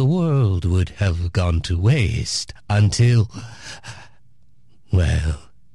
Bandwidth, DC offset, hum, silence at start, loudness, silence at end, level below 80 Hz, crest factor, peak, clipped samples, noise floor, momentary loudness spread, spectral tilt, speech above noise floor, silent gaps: 11.5 kHz; 0.7%; none; 0 s; -20 LUFS; 0.35 s; -28 dBFS; 12 dB; -8 dBFS; under 0.1%; -58 dBFS; 18 LU; -6 dB/octave; 39 dB; none